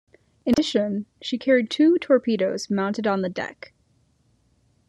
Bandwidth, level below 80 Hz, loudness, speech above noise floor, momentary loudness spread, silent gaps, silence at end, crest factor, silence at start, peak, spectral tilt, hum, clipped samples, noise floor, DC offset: 11.5 kHz; -60 dBFS; -23 LUFS; 42 dB; 11 LU; none; 1.4 s; 16 dB; 0.45 s; -6 dBFS; -5.5 dB/octave; none; under 0.1%; -64 dBFS; under 0.1%